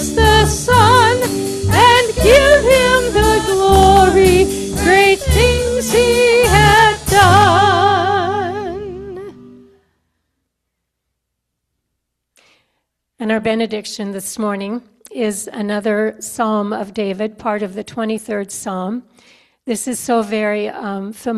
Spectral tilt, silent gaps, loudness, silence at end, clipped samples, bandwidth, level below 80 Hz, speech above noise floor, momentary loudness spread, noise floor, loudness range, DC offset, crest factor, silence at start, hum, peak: -4.5 dB/octave; none; -13 LUFS; 0 s; under 0.1%; 15 kHz; -30 dBFS; 56 dB; 15 LU; -75 dBFS; 13 LU; under 0.1%; 14 dB; 0 s; none; 0 dBFS